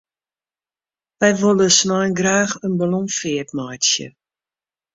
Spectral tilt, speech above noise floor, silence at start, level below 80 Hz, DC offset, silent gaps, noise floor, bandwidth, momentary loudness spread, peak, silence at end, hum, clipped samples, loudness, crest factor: -3 dB/octave; over 72 dB; 1.2 s; -60 dBFS; under 0.1%; none; under -90 dBFS; 7.8 kHz; 10 LU; -2 dBFS; 0.85 s; none; under 0.1%; -17 LUFS; 18 dB